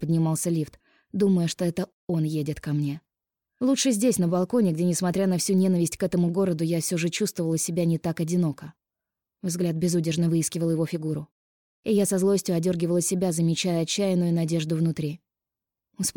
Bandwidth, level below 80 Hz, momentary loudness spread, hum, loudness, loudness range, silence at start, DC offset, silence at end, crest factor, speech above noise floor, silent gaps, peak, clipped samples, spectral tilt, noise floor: 17.5 kHz; -62 dBFS; 8 LU; none; -25 LUFS; 4 LU; 0 s; under 0.1%; 0.05 s; 14 dB; 65 dB; 1.93-2.07 s, 11.31-11.83 s; -12 dBFS; under 0.1%; -5.5 dB/octave; -89 dBFS